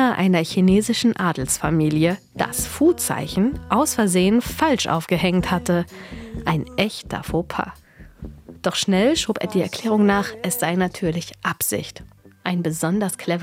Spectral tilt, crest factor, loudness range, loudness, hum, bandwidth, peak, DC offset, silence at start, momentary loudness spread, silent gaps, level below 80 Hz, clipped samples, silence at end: -5 dB/octave; 18 dB; 4 LU; -21 LUFS; none; 16.5 kHz; -2 dBFS; under 0.1%; 0 s; 10 LU; none; -44 dBFS; under 0.1%; 0 s